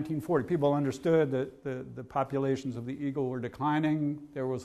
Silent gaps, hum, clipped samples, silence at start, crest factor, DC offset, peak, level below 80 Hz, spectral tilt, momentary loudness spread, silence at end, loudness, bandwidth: none; none; under 0.1%; 0 s; 16 dB; under 0.1%; -14 dBFS; -64 dBFS; -8 dB/octave; 9 LU; 0 s; -31 LUFS; 13.5 kHz